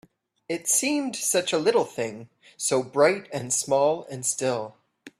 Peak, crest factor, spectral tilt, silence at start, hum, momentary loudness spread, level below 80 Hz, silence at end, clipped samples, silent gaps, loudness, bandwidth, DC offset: -6 dBFS; 20 dB; -2.5 dB/octave; 0.5 s; none; 11 LU; -70 dBFS; 0.1 s; under 0.1%; none; -24 LUFS; 15.5 kHz; under 0.1%